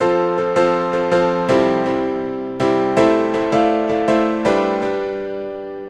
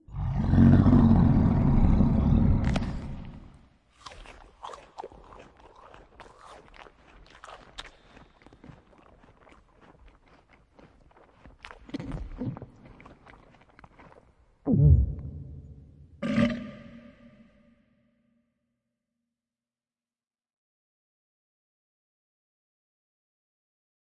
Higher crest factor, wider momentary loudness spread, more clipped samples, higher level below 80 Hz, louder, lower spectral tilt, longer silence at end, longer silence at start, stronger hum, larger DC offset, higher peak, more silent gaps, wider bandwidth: about the same, 16 dB vs 20 dB; second, 8 LU vs 28 LU; neither; second, -48 dBFS vs -36 dBFS; first, -17 LUFS vs -24 LUFS; second, -6.5 dB/octave vs -9 dB/octave; second, 0 s vs 7.25 s; about the same, 0 s vs 0.1 s; neither; neither; first, -2 dBFS vs -8 dBFS; neither; first, 9.8 kHz vs 8.4 kHz